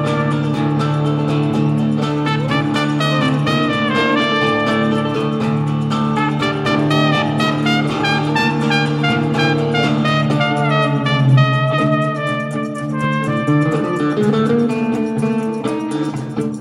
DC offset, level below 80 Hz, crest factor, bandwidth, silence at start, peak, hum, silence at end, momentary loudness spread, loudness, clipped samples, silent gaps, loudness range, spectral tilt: under 0.1%; -50 dBFS; 14 dB; 11.5 kHz; 0 s; -2 dBFS; none; 0 s; 5 LU; -16 LUFS; under 0.1%; none; 2 LU; -6.5 dB/octave